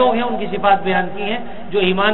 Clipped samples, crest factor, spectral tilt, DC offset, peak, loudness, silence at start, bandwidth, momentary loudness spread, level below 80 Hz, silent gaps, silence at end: under 0.1%; 16 dB; -10.5 dB/octave; 5%; 0 dBFS; -18 LUFS; 0 s; 4.2 kHz; 8 LU; -46 dBFS; none; 0 s